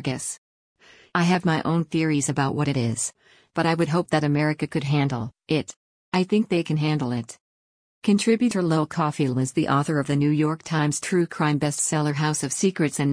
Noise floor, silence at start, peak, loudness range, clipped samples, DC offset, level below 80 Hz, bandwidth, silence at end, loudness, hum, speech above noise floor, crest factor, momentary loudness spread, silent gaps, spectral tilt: under -90 dBFS; 0 s; -8 dBFS; 2 LU; under 0.1%; under 0.1%; -60 dBFS; 10.5 kHz; 0 s; -23 LUFS; none; over 67 dB; 16 dB; 7 LU; 0.38-0.75 s, 5.76-6.12 s, 7.41-8.02 s; -5.5 dB/octave